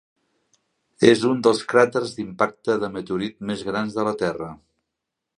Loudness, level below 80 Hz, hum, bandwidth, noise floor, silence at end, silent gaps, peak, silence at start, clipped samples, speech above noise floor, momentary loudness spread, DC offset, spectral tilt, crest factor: -22 LUFS; -60 dBFS; none; 11 kHz; -82 dBFS; 0.85 s; none; -2 dBFS; 1 s; under 0.1%; 61 dB; 11 LU; under 0.1%; -5 dB/octave; 22 dB